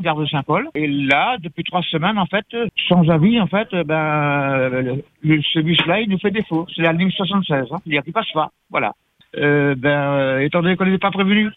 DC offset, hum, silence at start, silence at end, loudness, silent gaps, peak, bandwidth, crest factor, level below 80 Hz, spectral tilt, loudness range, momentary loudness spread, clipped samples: under 0.1%; none; 0 s; 0.05 s; -18 LUFS; none; -2 dBFS; 4.2 kHz; 16 dB; -54 dBFS; -8.5 dB/octave; 2 LU; 7 LU; under 0.1%